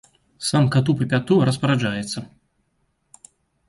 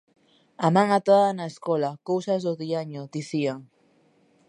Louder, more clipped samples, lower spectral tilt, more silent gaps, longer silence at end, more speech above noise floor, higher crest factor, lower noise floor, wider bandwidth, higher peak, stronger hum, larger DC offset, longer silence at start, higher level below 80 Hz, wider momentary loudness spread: first, -21 LUFS vs -24 LUFS; neither; about the same, -6 dB/octave vs -6.5 dB/octave; neither; first, 1.4 s vs 0.85 s; first, 49 dB vs 38 dB; about the same, 16 dB vs 20 dB; first, -69 dBFS vs -62 dBFS; about the same, 11.5 kHz vs 11 kHz; about the same, -6 dBFS vs -6 dBFS; neither; neither; second, 0.4 s vs 0.6 s; first, -56 dBFS vs -78 dBFS; about the same, 10 LU vs 12 LU